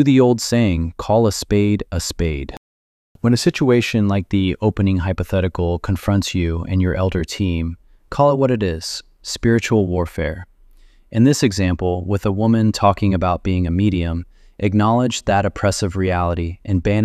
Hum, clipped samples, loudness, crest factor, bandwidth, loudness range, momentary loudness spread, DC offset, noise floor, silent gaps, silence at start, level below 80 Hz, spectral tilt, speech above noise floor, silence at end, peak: none; under 0.1%; -18 LUFS; 16 dB; 14 kHz; 2 LU; 9 LU; under 0.1%; -48 dBFS; 2.57-3.15 s; 0 s; -34 dBFS; -6 dB/octave; 30 dB; 0 s; -2 dBFS